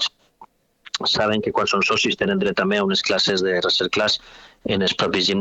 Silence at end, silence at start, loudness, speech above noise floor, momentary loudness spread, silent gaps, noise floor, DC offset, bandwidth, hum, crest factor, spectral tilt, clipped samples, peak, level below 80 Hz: 0 s; 0 s; -20 LUFS; 30 dB; 6 LU; none; -50 dBFS; under 0.1%; 8.2 kHz; none; 16 dB; -3.5 dB/octave; under 0.1%; -6 dBFS; -54 dBFS